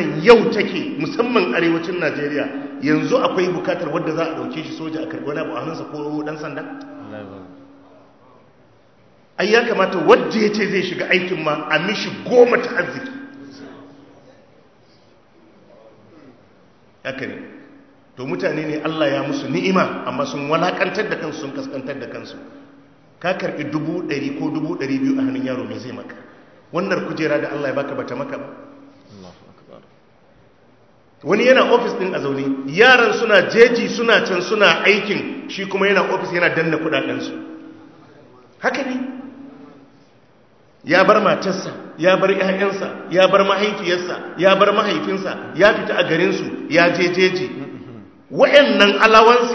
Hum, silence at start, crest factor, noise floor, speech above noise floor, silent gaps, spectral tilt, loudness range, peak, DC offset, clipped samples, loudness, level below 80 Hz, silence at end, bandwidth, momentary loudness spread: none; 0 s; 18 dB; -53 dBFS; 35 dB; none; -5 dB/octave; 14 LU; 0 dBFS; 0.1%; under 0.1%; -17 LUFS; -62 dBFS; 0 s; 8 kHz; 18 LU